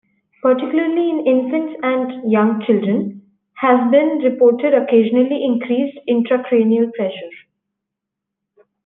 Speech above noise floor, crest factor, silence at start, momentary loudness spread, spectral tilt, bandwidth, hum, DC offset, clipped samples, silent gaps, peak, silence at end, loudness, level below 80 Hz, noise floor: 66 dB; 14 dB; 0.45 s; 7 LU; -10 dB/octave; 3.9 kHz; none; under 0.1%; under 0.1%; none; -2 dBFS; 1.45 s; -16 LUFS; -72 dBFS; -81 dBFS